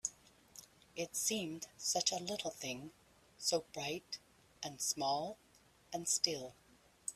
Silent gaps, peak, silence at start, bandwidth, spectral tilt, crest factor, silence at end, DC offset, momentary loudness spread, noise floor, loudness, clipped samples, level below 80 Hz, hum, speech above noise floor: none; -16 dBFS; 0.05 s; 15.5 kHz; -1.5 dB/octave; 26 dB; 0 s; under 0.1%; 19 LU; -63 dBFS; -39 LUFS; under 0.1%; -76 dBFS; none; 23 dB